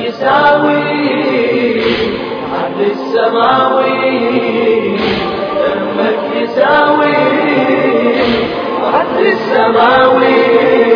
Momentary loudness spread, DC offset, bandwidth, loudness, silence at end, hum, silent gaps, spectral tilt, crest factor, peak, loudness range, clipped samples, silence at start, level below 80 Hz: 7 LU; under 0.1%; 5.4 kHz; -11 LUFS; 0 s; none; none; -7 dB/octave; 10 dB; 0 dBFS; 2 LU; 0.1%; 0 s; -46 dBFS